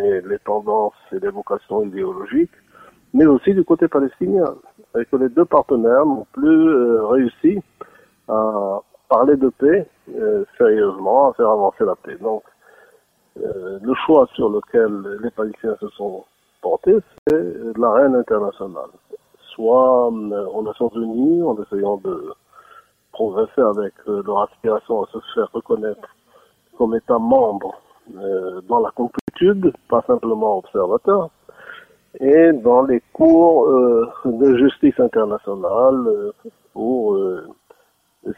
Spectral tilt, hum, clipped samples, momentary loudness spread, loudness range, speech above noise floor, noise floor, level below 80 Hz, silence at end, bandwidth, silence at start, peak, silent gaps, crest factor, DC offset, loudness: -8.5 dB/octave; none; under 0.1%; 13 LU; 7 LU; 44 dB; -60 dBFS; -56 dBFS; 0.05 s; 3.8 kHz; 0 s; 0 dBFS; 17.18-17.26 s, 29.21-29.27 s; 16 dB; under 0.1%; -18 LUFS